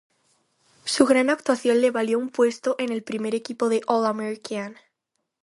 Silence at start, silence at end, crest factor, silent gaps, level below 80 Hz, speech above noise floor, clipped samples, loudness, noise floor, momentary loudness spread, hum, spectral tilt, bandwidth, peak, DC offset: 0.85 s; 0.7 s; 22 dB; none; -72 dBFS; 57 dB; under 0.1%; -23 LUFS; -79 dBFS; 12 LU; none; -4 dB/octave; 11.5 kHz; -2 dBFS; under 0.1%